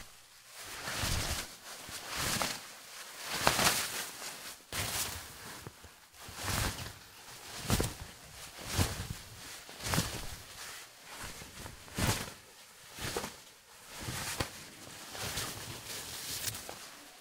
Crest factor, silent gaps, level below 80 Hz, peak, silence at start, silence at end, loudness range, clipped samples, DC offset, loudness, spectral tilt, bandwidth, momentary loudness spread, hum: 36 dB; none; -52 dBFS; -4 dBFS; 0 s; 0 s; 7 LU; under 0.1%; under 0.1%; -37 LUFS; -2.5 dB/octave; 16 kHz; 15 LU; none